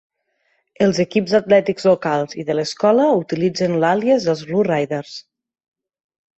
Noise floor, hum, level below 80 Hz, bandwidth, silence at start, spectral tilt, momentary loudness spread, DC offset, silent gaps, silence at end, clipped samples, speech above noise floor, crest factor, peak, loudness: -67 dBFS; none; -60 dBFS; 8.2 kHz; 0.8 s; -6 dB/octave; 7 LU; under 0.1%; none; 1.2 s; under 0.1%; 50 dB; 16 dB; -2 dBFS; -18 LUFS